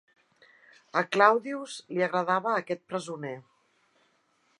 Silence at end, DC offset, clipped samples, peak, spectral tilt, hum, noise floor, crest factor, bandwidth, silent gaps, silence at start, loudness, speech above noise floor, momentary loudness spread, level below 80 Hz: 1.2 s; under 0.1%; under 0.1%; -6 dBFS; -4.5 dB/octave; none; -70 dBFS; 24 dB; 11.5 kHz; none; 0.95 s; -28 LUFS; 42 dB; 15 LU; -86 dBFS